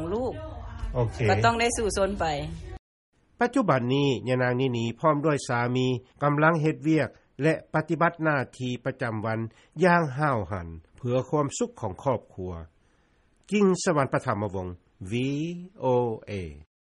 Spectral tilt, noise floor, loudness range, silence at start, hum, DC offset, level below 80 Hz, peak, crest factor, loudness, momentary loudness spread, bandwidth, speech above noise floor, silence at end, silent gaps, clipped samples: -6 dB/octave; -64 dBFS; 3 LU; 0 s; none; under 0.1%; -46 dBFS; -8 dBFS; 18 dB; -26 LUFS; 14 LU; 11.5 kHz; 38 dB; 0.25 s; 2.79-3.13 s; under 0.1%